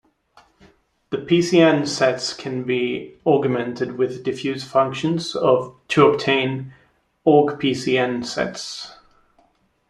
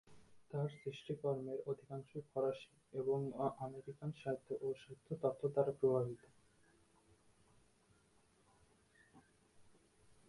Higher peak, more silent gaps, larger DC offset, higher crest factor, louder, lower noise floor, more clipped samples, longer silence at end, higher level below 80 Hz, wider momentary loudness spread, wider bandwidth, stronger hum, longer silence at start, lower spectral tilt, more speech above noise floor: first, -2 dBFS vs -22 dBFS; neither; neither; about the same, 18 dB vs 22 dB; first, -20 LUFS vs -42 LUFS; second, -61 dBFS vs -73 dBFS; neither; first, 0.95 s vs 0.6 s; first, -60 dBFS vs -78 dBFS; about the same, 12 LU vs 13 LU; about the same, 12 kHz vs 11.5 kHz; neither; first, 1.1 s vs 0.05 s; second, -5.5 dB/octave vs -8 dB/octave; first, 42 dB vs 32 dB